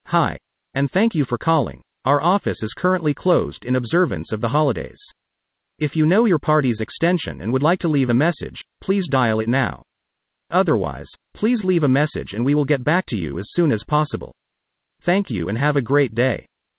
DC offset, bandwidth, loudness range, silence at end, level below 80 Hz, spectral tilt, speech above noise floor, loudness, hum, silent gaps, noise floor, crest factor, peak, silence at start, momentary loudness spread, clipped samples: under 0.1%; 4 kHz; 2 LU; 0.35 s; -48 dBFS; -11 dB/octave; 59 dB; -20 LUFS; none; none; -78 dBFS; 16 dB; -4 dBFS; 0.05 s; 10 LU; under 0.1%